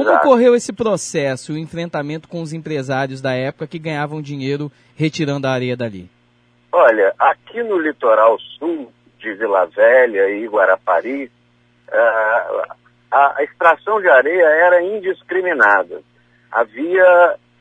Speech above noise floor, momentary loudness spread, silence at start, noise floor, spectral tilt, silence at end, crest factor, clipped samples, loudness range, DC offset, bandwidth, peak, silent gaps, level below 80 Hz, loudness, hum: 41 dB; 14 LU; 0 s; -56 dBFS; -5.5 dB/octave; 0.25 s; 16 dB; under 0.1%; 8 LU; under 0.1%; 10.5 kHz; 0 dBFS; none; -64 dBFS; -16 LUFS; none